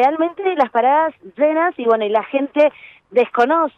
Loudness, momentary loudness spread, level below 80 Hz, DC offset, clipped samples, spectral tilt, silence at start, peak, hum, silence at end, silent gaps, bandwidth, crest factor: -17 LUFS; 4 LU; -68 dBFS; under 0.1%; under 0.1%; -6 dB/octave; 0 s; -4 dBFS; none; 0.1 s; none; 6.6 kHz; 12 dB